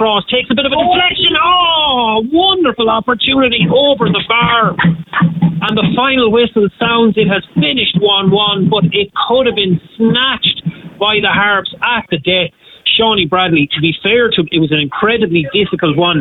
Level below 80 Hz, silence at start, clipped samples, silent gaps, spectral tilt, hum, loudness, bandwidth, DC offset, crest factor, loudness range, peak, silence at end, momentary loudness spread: -44 dBFS; 0 s; under 0.1%; none; -8.5 dB/octave; none; -11 LUFS; 4.2 kHz; under 0.1%; 10 dB; 2 LU; -2 dBFS; 0 s; 4 LU